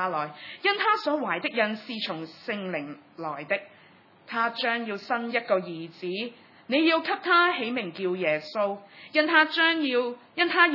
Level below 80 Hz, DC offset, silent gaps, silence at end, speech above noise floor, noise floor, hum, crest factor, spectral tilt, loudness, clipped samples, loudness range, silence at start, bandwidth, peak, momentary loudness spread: under -90 dBFS; under 0.1%; none; 0 s; 29 dB; -56 dBFS; none; 22 dB; -5.5 dB/octave; -26 LUFS; under 0.1%; 7 LU; 0 s; 6 kHz; -6 dBFS; 14 LU